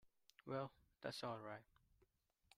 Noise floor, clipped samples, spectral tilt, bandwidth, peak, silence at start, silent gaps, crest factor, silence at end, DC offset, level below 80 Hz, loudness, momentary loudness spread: -81 dBFS; under 0.1%; -5.5 dB/octave; 15 kHz; -34 dBFS; 0.05 s; none; 20 dB; 0.95 s; under 0.1%; -82 dBFS; -51 LUFS; 9 LU